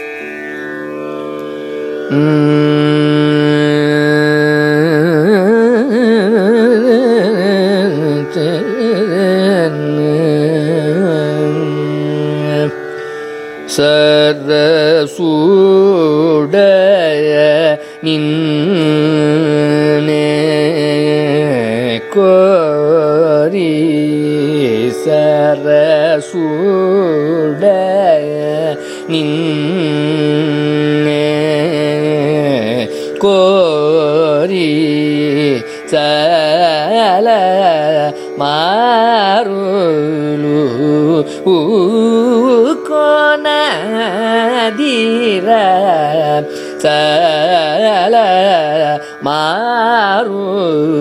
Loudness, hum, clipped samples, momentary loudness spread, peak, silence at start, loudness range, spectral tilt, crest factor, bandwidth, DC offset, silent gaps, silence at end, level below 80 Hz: -11 LUFS; none; under 0.1%; 7 LU; 0 dBFS; 0 s; 3 LU; -6.5 dB/octave; 12 dB; 14 kHz; under 0.1%; none; 0 s; -60 dBFS